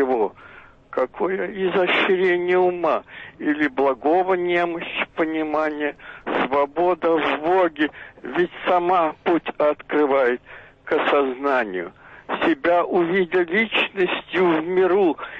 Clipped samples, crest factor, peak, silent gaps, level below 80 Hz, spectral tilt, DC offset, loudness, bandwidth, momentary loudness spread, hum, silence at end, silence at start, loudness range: under 0.1%; 12 dB; -8 dBFS; none; -58 dBFS; -7 dB/octave; under 0.1%; -21 LUFS; 6 kHz; 8 LU; none; 0 s; 0 s; 2 LU